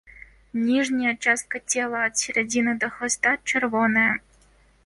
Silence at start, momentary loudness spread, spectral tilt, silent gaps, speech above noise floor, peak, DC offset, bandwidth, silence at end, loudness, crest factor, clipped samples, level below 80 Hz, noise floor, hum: 0.55 s; 5 LU; -2.5 dB/octave; none; 34 dB; -8 dBFS; under 0.1%; 11.5 kHz; 0.7 s; -23 LUFS; 16 dB; under 0.1%; -58 dBFS; -58 dBFS; none